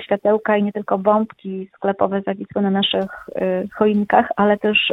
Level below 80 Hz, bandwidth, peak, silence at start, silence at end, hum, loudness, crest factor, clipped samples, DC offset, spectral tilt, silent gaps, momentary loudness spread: -58 dBFS; 4.1 kHz; 0 dBFS; 0 s; 0 s; none; -19 LUFS; 18 dB; under 0.1%; under 0.1%; -8 dB/octave; none; 9 LU